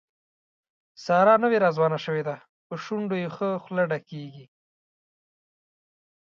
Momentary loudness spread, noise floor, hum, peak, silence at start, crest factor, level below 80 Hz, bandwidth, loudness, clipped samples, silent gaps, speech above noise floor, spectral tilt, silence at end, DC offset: 20 LU; under -90 dBFS; none; -6 dBFS; 1 s; 20 dB; -78 dBFS; 7.4 kHz; -24 LUFS; under 0.1%; 2.49-2.70 s; over 66 dB; -7 dB/octave; 1.95 s; under 0.1%